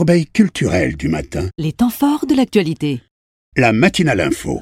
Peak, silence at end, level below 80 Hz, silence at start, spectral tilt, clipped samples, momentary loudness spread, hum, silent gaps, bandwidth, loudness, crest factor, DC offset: 0 dBFS; 0 s; -38 dBFS; 0 s; -6 dB/octave; under 0.1%; 9 LU; none; 3.11-3.52 s; 16.5 kHz; -16 LUFS; 16 dB; under 0.1%